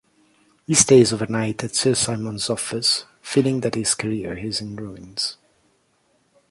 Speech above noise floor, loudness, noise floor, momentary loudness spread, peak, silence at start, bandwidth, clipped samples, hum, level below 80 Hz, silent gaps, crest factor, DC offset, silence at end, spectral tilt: 44 dB; -20 LUFS; -64 dBFS; 13 LU; -2 dBFS; 0.7 s; 11.5 kHz; under 0.1%; none; -54 dBFS; none; 22 dB; under 0.1%; 1.15 s; -3.5 dB/octave